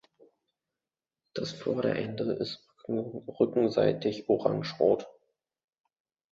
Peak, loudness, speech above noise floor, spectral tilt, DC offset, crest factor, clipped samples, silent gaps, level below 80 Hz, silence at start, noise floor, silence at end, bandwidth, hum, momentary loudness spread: -10 dBFS; -30 LUFS; over 61 dB; -7 dB/octave; under 0.1%; 22 dB; under 0.1%; none; -68 dBFS; 1.35 s; under -90 dBFS; 1.2 s; 7.8 kHz; none; 11 LU